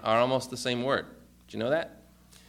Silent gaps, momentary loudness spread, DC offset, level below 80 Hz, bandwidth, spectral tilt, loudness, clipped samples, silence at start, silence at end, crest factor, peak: none; 17 LU; under 0.1%; -62 dBFS; 16 kHz; -4.5 dB/octave; -29 LUFS; under 0.1%; 0 s; 0.55 s; 20 dB; -10 dBFS